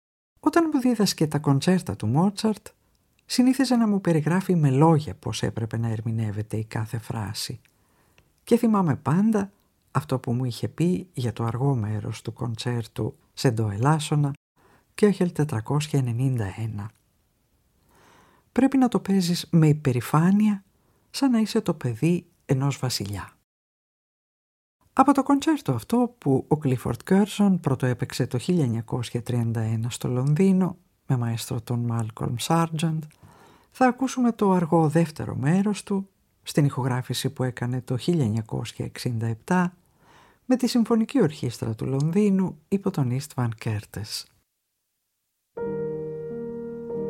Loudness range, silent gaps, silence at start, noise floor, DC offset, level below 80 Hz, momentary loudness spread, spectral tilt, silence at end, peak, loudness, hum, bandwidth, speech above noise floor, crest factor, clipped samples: 5 LU; 14.37-14.55 s, 23.44-24.80 s; 0.45 s; -77 dBFS; under 0.1%; -58 dBFS; 12 LU; -6.5 dB/octave; 0 s; -4 dBFS; -25 LUFS; none; 16 kHz; 54 dB; 20 dB; under 0.1%